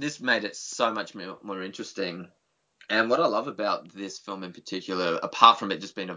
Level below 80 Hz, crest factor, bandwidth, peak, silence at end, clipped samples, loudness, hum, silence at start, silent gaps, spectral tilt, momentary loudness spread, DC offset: -76 dBFS; 26 dB; 7.8 kHz; 0 dBFS; 0 s; under 0.1%; -26 LUFS; none; 0 s; none; -3 dB/octave; 19 LU; under 0.1%